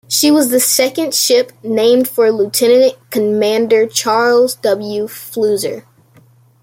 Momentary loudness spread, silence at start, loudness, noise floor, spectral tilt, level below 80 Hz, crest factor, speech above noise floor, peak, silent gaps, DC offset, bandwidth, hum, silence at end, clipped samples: 8 LU; 0.1 s; -13 LUFS; -48 dBFS; -2.5 dB/octave; -62 dBFS; 12 dB; 35 dB; 0 dBFS; none; under 0.1%; 16.5 kHz; none; 0.8 s; under 0.1%